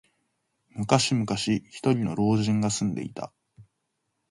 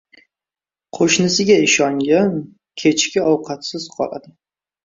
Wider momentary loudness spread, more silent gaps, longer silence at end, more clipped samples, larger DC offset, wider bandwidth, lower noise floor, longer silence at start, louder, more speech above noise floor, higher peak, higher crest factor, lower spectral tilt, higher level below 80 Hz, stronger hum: about the same, 14 LU vs 14 LU; neither; about the same, 0.7 s vs 0.65 s; neither; neither; first, 11.5 kHz vs 7.8 kHz; second, -78 dBFS vs under -90 dBFS; second, 0.75 s vs 0.95 s; second, -26 LUFS vs -16 LUFS; second, 53 dB vs over 73 dB; second, -6 dBFS vs -2 dBFS; first, 22 dB vs 16 dB; first, -5 dB/octave vs -3.5 dB/octave; about the same, -58 dBFS vs -60 dBFS; neither